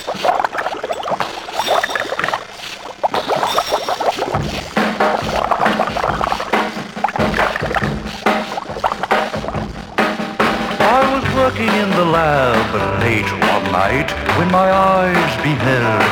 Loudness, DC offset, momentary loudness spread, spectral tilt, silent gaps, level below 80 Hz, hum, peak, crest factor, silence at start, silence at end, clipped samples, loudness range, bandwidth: -17 LUFS; under 0.1%; 8 LU; -5 dB/octave; none; -38 dBFS; none; -2 dBFS; 16 dB; 0 s; 0 s; under 0.1%; 4 LU; over 20 kHz